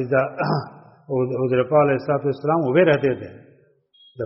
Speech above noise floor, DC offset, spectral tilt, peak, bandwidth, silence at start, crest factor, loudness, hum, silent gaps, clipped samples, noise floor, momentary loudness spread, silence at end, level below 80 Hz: 37 dB; under 0.1%; -6.5 dB/octave; -4 dBFS; 5.8 kHz; 0 s; 18 dB; -20 LUFS; none; none; under 0.1%; -57 dBFS; 10 LU; 0 s; -60 dBFS